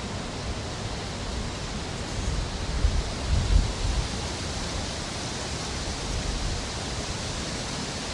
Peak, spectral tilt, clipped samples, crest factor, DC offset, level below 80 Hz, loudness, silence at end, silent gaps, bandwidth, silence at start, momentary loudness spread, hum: -8 dBFS; -4 dB/octave; under 0.1%; 20 dB; under 0.1%; -32 dBFS; -30 LUFS; 0 s; none; 11.5 kHz; 0 s; 5 LU; none